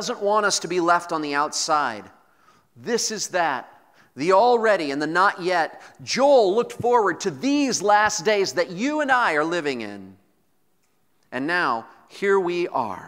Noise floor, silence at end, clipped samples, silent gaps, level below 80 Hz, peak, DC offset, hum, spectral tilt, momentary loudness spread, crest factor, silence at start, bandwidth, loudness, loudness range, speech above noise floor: -69 dBFS; 0 s; under 0.1%; none; -68 dBFS; -4 dBFS; under 0.1%; none; -3 dB/octave; 11 LU; 18 dB; 0 s; 16 kHz; -21 LUFS; 5 LU; 48 dB